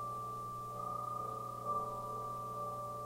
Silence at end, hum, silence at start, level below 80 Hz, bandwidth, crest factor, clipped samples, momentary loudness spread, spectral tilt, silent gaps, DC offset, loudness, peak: 0 s; 60 Hz at -55 dBFS; 0 s; -66 dBFS; 16 kHz; 14 dB; under 0.1%; 4 LU; -6 dB/octave; none; under 0.1%; -42 LUFS; -28 dBFS